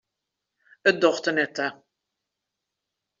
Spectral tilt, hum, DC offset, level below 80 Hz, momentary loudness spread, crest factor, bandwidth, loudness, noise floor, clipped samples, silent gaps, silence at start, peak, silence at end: -2 dB/octave; none; under 0.1%; -74 dBFS; 9 LU; 24 dB; 7.6 kHz; -24 LUFS; -84 dBFS; under 0.1%; none; 0.85 s; -4 dBFS; 1.45 s